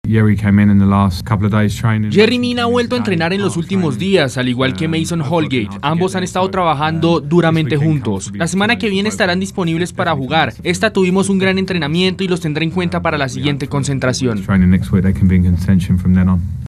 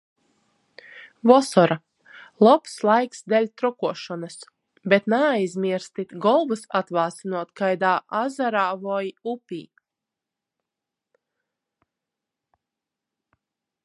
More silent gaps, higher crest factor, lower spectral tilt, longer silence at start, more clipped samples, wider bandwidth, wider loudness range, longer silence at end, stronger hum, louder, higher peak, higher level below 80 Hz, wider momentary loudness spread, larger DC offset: neither; second, 14 dB vs 24 dB; about the same, -6 dB/octave vs -5.5 dB/octave; second, 0.05 s vs 0.95 s; neither; first, 13 kHz vs 11.5 kHz; second, 2 LU vs 9 LU; second, 0 s vs 4.2 s; neither; first, -15 LUFS vs -22 LUFS; about the same, 0 dBFS vs 0 dBFS; first, -36 dBFS vs -76 dBFS; second, 5 LU vs 16 LU; neither